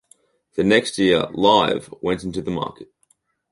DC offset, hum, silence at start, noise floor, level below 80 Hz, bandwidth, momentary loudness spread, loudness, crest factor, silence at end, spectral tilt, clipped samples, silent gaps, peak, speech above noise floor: under 0.1%; none; 0.55 s; -64 dBFS; -52 dBFS; 11.5 kHz; 11 LU; -19 LUFS; 20 dB; 0.65 s; -5 dB/octave; under 0.1%; none; -2 dBFS; 45 dB